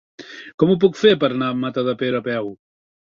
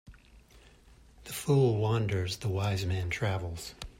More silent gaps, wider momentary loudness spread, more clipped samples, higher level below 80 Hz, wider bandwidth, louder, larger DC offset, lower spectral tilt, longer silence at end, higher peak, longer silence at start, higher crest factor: first, 0.54-0.58 s vs none; first, 20 LU vs 14 LU; neither; second, -60 dBFS vs -54 dBFS; second, 7.4 kHz vs 16 kHz; first, -19 LUFS vs -31 LUFS; neither; about the same, -6.5 dB/octave vs -6 dB/octave; first, 0.55 s vs 0.1 s; first, -2 dBFS vs -16 dBFS; first, 0.2 s vs 0.05 s; about the same, 18 dB vs 16 dB